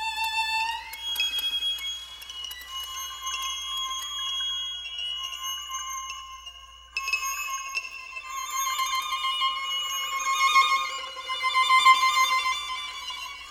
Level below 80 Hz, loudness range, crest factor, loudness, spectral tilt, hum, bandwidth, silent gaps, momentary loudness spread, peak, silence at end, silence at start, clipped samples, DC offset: -60 dBFS; 9 LU; 22 dB; -26 LUFS; 3 dB/octave; 50 Hz at -75 dBFS; 19.5 kHz; none; 15 LU; -6 dBFS; 0 s; 0 s; under 0.1%; under 0.1%